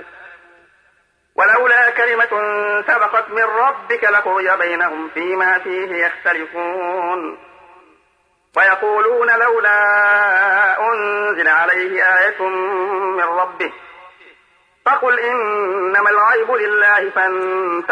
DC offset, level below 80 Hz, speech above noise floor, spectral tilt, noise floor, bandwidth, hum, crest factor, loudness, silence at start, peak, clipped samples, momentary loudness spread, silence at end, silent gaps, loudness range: under 0.1%; -70 dBFS; 44 dB; -4 dB/octave; -60 dBFS; 10 kHz; none; 12 dB; -15 LUFS; 0 s; -4 dBFS; under 0.1%; 9 LU; 0 s; none; 6 LU